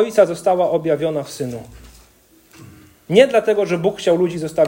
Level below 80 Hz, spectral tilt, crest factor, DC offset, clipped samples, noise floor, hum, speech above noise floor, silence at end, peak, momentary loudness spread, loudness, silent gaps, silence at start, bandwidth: -52 dBFS; -5.5 dB/octave; 18 dB; under 0.1%; under 0.1%; -52 dBFS; none; 35 dB; 0 s; 0 dBFS; 13 LU; -17 LUFS; none; 0 s; 16.5 kHz